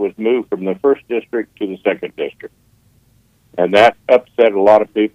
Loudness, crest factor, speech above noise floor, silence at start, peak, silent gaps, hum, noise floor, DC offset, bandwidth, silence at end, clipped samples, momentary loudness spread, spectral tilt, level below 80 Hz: -15 LUFS; 16 dB; 40 dB; 0 s; 0 dBFS; none; none; -55 dBFS; under 0.1%; 10.5 kHz; 0.05 s; under 0.1%; 14 LU; -6 dB/octave; -60 dBFS